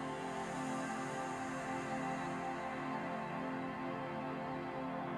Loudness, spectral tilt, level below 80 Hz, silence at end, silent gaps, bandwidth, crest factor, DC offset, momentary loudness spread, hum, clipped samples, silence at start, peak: -41 LUFS; -5.5 dB/octave; -68 dBFS; 0 s; none; 14 kHz; 12 dB; under 0.1%; 2 LU; none; under 0.1%; 0 s; -28 dBFS